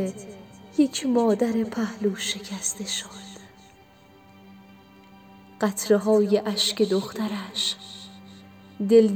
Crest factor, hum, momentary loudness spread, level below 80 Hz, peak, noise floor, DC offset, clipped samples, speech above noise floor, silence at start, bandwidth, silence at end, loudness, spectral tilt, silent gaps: 20 dB; none; 21 LU; -68 dBFS; -6 dBFS; -53 dBFS; under 0.1%; under 0.1%; 29 dB; 0 s; over 20 kHz; 0 s; -24 LUFS; -4 dB/octave; none